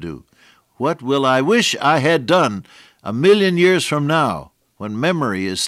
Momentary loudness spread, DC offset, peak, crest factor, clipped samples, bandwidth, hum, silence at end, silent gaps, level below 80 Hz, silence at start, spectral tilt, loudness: 17 LU; under 0.1%; -4 dBFS; 14 dB; under 0.1%; 15.5 kHz; none; 0 s; none; -58 dBFS; 0 s; -4.5 dB/octave; -16 LUFS